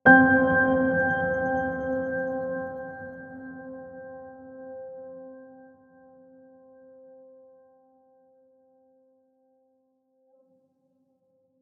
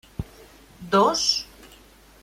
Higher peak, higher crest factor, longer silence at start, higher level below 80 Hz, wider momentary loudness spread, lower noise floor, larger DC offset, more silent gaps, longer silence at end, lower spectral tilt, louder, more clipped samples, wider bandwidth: about the same, -4 dBFS vs -6 dBFS; about the same, 24 dB vs 20 dB; second, 0.05 s vs 0.2 s; second, -60 dBFS vs -48 dBFS; about the same, 24 LU vs 22 LU; first, -70 dBFS vs -51 dBFS; neither; neither; first, 6.15 s vs 0.55 s; first, -9 dB/octave vs -3 dB/octave; about the same, -23 LUFS vs -21 LUFS; neither; second, 3.4 kHz vs 16.5 kHz